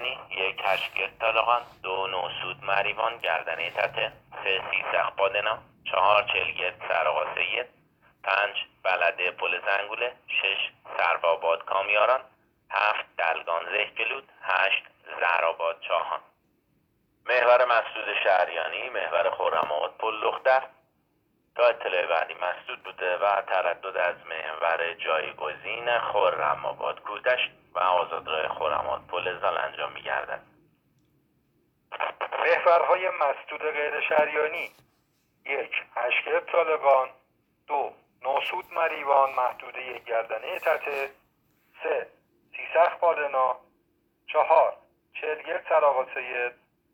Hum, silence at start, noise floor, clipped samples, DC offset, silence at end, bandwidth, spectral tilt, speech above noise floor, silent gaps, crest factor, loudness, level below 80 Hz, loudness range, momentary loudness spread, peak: none; 0 s; -70 dBFS; under 0.1%; under 0.1%; 0.4 s; 16 kHz; -4 dB/octave; 44 dB; none; 20 dB; -26 LUFS; -70 dBFS; 3 LU; 10 LU; -6 dBFS